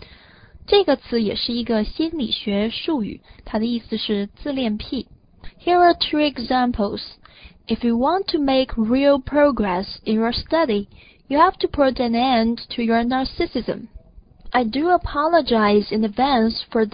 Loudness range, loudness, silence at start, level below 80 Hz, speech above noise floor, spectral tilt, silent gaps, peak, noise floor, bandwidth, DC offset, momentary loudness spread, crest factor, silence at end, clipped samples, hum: 4 LU; -20 LUFS; 0.55 s; -42 dBFS; 28 dB; -10 dB/octave; none; -2 dBFS; -47 dBFS; 5.2 kHz; under 0.1%; 10 LU; 18 dB; 0.05 s; under 0.1%; none